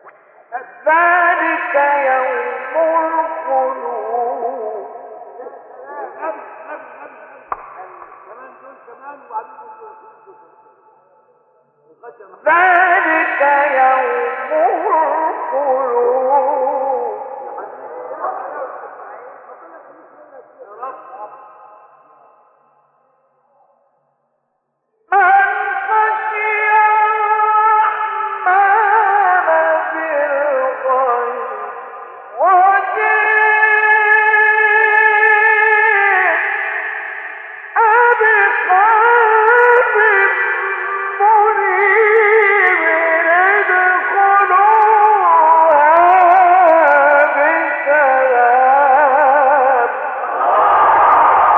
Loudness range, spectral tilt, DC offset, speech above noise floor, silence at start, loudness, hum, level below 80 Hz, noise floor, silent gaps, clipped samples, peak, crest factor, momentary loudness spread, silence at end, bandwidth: 19 LU; -5 dB/octave; under 0.1%; 55 dB; 0.5 s; -12 LUFS; none; -64 dBFS; -69 dBFS; none; under 0.1%; 0 dBFS; 14 dB; 19 LU; 0 s; 4.1 kHz